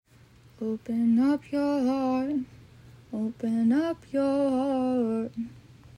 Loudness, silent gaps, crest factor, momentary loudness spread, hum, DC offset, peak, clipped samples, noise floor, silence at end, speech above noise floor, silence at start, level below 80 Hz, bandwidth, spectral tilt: -27 LUFS; none; 12 dB; 11 LU; none; under 0.1%; -16 dBFS; under 0.1%; -56 dBFS; 0.1 s; 29 dB; 0.6 s; -62 dBFS; 11 kHz; -7.5 dB/octave